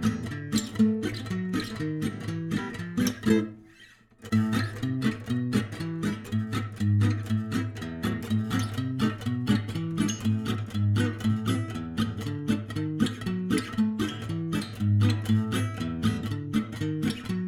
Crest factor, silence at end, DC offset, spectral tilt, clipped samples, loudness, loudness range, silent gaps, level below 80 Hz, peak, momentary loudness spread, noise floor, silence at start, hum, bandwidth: 18 dB; 0 s; under 0.1%; -6.5 dB/octave; under 0.1%; -29 LUFS; 2 LU; none; -52 dBFS; -10 dBFS; 7 LU; -55 dBFS; 0 s; none; 15.5 kHz